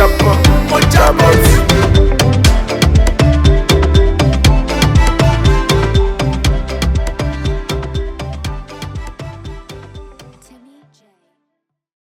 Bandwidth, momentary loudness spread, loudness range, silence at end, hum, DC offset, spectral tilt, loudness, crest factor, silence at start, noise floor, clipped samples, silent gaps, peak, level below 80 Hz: 17 kHz; 18 LU; 18 LU; 1.8 s; none; under 0.1%; -5.5 dB/octave; -12 LUFS; 12 dB; 0 s; -73 dBFS; 0.1%; none; 0 dBFS; -16 dBFS